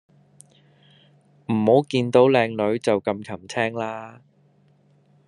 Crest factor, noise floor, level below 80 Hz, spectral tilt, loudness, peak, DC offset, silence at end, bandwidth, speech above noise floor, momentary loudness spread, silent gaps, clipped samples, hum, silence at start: 20 dB; -59 dBFS; -68 dBFS; -6.5 dB/octave; -21 LUFS; -2 dBFS; under 0.1%; 1.15 s; 11 kHz; 38 dB; 15 LU; none; under 0.1%; none; 1.5 s